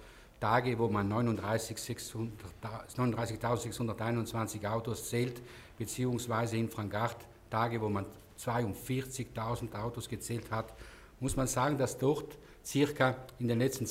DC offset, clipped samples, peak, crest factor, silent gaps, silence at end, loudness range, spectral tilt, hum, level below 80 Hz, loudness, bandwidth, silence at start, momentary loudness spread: under 0.1%; under 0.1%; -14 dBFS; 22 dB; none; 0 s; 3 LU; -5.5 dB/octave; none; -56 dBFS; -35 LUFS; 16 kHz; 0 s; 11 LU